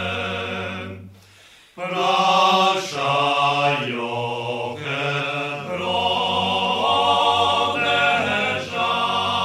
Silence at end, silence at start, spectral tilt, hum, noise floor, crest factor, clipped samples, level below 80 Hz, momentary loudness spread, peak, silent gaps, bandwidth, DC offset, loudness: 0 s; 0 s; -3.5 dB/octave; none; -49 dBFS; 16 dB; under 0.1%; -62 dBFS; 10 LU; -4 dBFS; none; 14.5 kHz; under 0.1%; -20 LUFS